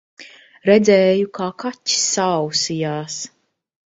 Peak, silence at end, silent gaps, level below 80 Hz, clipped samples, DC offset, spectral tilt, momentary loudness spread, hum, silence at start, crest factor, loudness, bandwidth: 0 dBFS; 0.7 s; none; -62 dBFS; under 0.1%; under 0.1%; -3.5 dB/octave; 13 LU; none; 0.2 s; 18 dB; -18 LUFS; 8 kHz